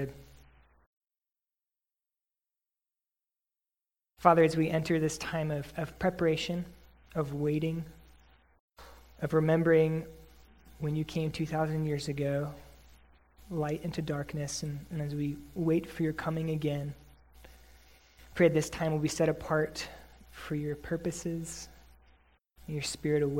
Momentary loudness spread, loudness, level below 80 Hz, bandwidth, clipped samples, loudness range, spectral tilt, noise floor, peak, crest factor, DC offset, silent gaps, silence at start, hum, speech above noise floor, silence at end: 15 LU; -32 LUFS; -56 dBFS; 16.5 kHz; under 0.1%; 6 LU; -6 dB/octave; under -90 dBFS; -6 dBFS; 26 dB; under 0.1%; 0.86-1.01 s, 8.60-8.68 s; 0 s; none; over 59 dB; 0 s